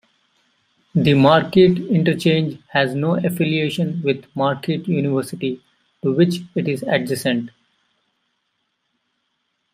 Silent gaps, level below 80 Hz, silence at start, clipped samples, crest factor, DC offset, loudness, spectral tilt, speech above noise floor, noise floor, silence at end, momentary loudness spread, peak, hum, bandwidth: none; -56 dBFS; 0.95 s; under 0.1%; 18 dB; under 0.1%; -19 LUFS; -6.5 dB/octave; 54 dB; -72 dBFS; 2.25 s; 11 LU; -2 dBFS; none; 15.5 kHz